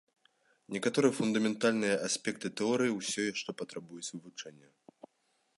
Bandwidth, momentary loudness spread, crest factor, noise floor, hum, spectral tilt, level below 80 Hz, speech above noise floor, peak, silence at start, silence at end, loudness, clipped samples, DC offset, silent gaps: 11.5 kHz; 14 LU; 20 dB; -76 dBFS; none; -4 dB/octave; -78 dBFS; 43 dB; -14 dBFS; 0.7 s; 1.05 s; -32 LUFS; under 0.1%; under 0.1%; none